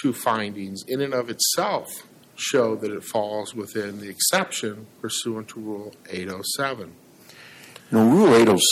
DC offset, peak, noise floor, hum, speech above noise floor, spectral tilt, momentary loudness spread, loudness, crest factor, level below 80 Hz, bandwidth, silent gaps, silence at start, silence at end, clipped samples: under 0.1%; -6 dBFS; -48 dBFS; none; 25 dB; -3.5 dB/octave; 19 LU; -22 LUFS; 18 dB; -68 dBFS; 16.5 kHz; none; 0 s; 0 s; under 0.1%